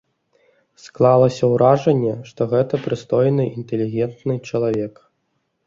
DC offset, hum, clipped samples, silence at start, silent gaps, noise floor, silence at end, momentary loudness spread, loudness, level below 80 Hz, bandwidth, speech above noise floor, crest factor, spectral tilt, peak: under 0.1%; none; under 0.1%; 0.85 s; none; -70 dBFS; 0.75 s; 10 LU; -19 LUFS; -58 dBFS; 7.6 kHz; 52 dB; 18 dB; -8 dB/octave; -2 dBFS